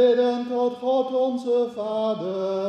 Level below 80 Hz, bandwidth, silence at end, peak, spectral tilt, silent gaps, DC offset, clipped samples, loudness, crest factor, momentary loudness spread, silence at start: -76 dBFS; 8.4 kHz; 0 s; -8 dBFS; -6.5 dB/octave; none; under 0.1%; under 0.1%; -24 LUFS; 14 dB; 4 LU; 0 s